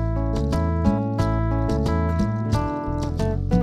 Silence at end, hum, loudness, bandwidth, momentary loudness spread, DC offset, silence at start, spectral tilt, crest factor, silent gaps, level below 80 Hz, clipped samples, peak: 0 s; none; -23 LUFS; 12 kHz; 3 LU; under 0.1%; 0 s; -8 dB/octave; 14 dB; none; -28 dBFS; under 0.1%; -6 dBFS